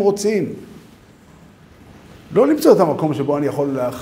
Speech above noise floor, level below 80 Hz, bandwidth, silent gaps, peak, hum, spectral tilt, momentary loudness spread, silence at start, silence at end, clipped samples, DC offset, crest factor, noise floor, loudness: 29 dB; -56 dBFS; 16 kHz; none; 0 dBFS; none; -6.5 dB/octave; 9 LU; 0 s; 0 s; under 0.1%; under 0.1%; 18 dB; -46 dBFS; -17 LUFS